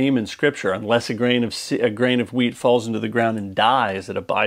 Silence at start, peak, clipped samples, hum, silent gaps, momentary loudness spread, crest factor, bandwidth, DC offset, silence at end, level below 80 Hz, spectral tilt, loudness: 0 s; -2 dBFS; under 0.1%; none; none; 5 LU; 18 dB; 15 kHz; under 0.1%; 0 s; -62 dBFS; -5 dB/octave; -20 LUFS